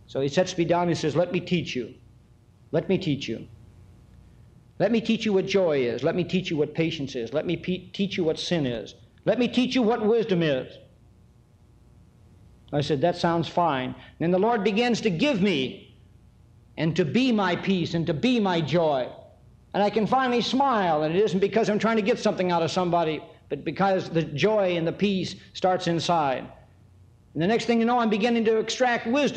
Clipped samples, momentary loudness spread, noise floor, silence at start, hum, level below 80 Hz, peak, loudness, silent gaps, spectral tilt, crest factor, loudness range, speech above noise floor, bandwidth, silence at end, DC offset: under 0.1%; 9 LU; -56 dBFS; 0.1 s; none; -58 dBFS; -10 dBFS; -25 LUFS; none; -6 dB/octave; 16 dB; 5 LU; 32 dB; 9.2 kHz; 0 s; under 0.1%